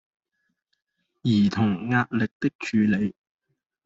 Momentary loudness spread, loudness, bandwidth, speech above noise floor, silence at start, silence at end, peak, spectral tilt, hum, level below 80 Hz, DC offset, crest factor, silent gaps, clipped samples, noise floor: 7 LU; -24 LUFS; 7.8 kHz; 54 dB; 1.25 s; 0.75 s; -8 dBFS; -7 dB/octave; none; -62 dBFS; under 0.1%; 18 dB; 2.31-2.40 s, 2.55-2.59 s; under 0.1%; -77 dBFS